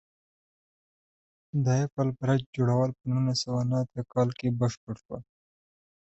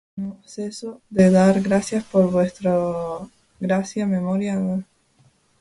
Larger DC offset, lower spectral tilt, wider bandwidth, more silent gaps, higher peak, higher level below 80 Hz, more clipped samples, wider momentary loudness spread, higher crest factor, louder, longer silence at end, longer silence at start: neither; about the same, -7 dB/octave vs -7 dB/octave; second, 8.2 kHz vs 11.5 kHz; first, 1.92-1.97 s, 2.46-2.53 s, 4.77-4.87 s, 5.05-5.09 s vs none; second, -12 dBFS vs -4 dBFS; second, -60 dBFS vs -54 dBFS; neither; second, 13 LU vs 16 LU; about the same, 18 dB vs 16 dB; second, -28 LUFS vs -21 LUFS; first, 0.9 s vs 0.75 s; first, 1.55 s vs 0.15 s